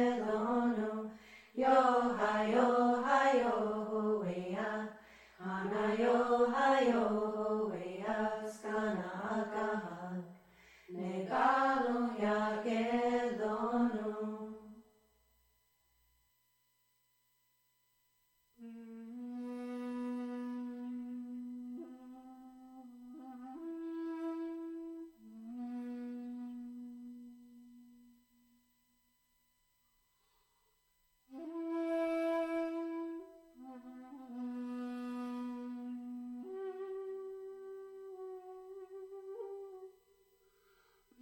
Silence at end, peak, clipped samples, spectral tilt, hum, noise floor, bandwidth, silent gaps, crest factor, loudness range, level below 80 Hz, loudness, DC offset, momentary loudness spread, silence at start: 1.3 s; -16 dBFS; under 0.1%; -6 dB/octave; 60 Hz at -65 dBFS; -77 dBFS; 16.5 kHz; none; 22 dB; 17 LU; -74 dBFS; -36 LUFS; under 0.1%; 22 LU; 0 s